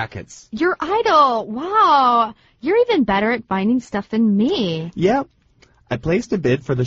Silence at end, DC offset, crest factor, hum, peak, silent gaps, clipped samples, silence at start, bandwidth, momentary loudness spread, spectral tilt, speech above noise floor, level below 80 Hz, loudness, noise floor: 0 s; under 0.1%; 16 dB; none; -2 dBFS; none; under 0.1%; 0 s; 7.8 kHz; 12 LU; -4.5 dB/octave; 37 dB; -48 dBFS; -18 LUFS; -55 dBFS